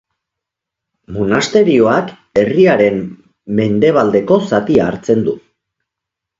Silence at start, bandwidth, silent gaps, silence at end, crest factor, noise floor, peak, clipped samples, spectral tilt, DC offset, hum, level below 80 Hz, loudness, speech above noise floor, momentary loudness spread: 1.1 s; 7.8 kHz; none; 1 s; 14 dB; -81 dBFS; 0 dBFS; under 0.1%; -6.5 dB/octave; under 0.1%; none; -48 dBFS; -13 LUFS; 69 dB; 10 LU